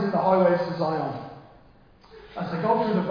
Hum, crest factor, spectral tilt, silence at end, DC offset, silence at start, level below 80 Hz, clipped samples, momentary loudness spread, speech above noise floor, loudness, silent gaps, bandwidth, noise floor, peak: none; 18 dB; -9 dB/octave; 0 s; under 0.1%; 0 s; -60 dBFS; under 0.1%; 18 LU; 30 dB; -24 LUFS; none; 5.2 kHz; -54 dBFS; -8 dBFS